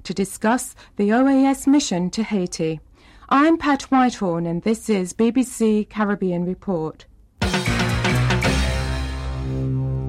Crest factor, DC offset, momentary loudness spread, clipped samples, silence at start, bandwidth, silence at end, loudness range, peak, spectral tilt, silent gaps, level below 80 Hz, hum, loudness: 12 dB; under 0.1%; 9 LU; under 0.1%; 0.05 s; 15.5 kHz; 0 s; 3 LU; -8 dBFS; -5.5 dB/octave; none; -34 dBFS; none; -21 LUFS